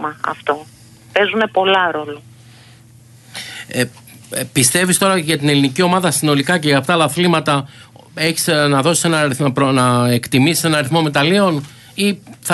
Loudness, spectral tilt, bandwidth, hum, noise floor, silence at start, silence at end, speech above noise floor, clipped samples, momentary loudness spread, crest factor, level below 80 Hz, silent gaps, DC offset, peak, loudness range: -15 LUFS; -4 dB/octave; 12.5 kHz; none; -44 dBFS; 0 s; 0 s; 29 dB; under 0.1%; 12 LU; 16 dB; -56 dBFS; none; under 0.1%; 0 dBFS; 5 LU